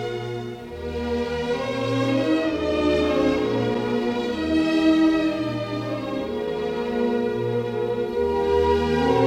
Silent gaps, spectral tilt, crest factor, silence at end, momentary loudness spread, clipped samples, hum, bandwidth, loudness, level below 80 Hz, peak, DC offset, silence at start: none; -6.5 dB/octave; 16 dB; 0 s; 8 LU; under 0.1%; none; 12 kHz; -23 LUFS; -46 dBFS; -6 dBFS; under 0.1%; 0 s